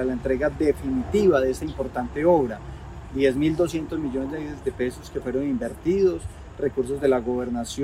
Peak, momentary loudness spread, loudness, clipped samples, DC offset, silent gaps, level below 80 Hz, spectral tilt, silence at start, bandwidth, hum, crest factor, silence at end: -8 dBFS; 11 LU; -24 LUFS; under 0.1%; under 0.1%; none; -42 dBFS; -6.5 dB/octave; 0 s; 15 kHz; none; 16 dB; 0 s